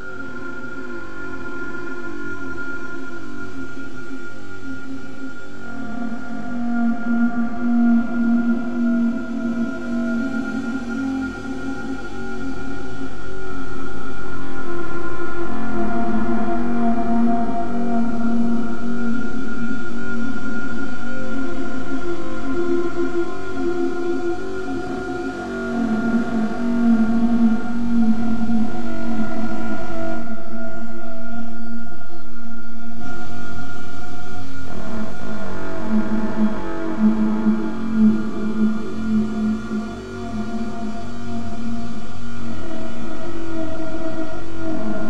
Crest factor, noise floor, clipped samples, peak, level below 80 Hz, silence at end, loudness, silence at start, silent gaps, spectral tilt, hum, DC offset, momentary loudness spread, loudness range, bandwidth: 8 dB; -36 dBFS; under 0.1%; -6 dBFS; -42 dBFS; 0 s; -24 LUFS; 0 s; none; -7 dB/octave; none; under 0.1%; 14 LU; 11 LU; 8.8 kHz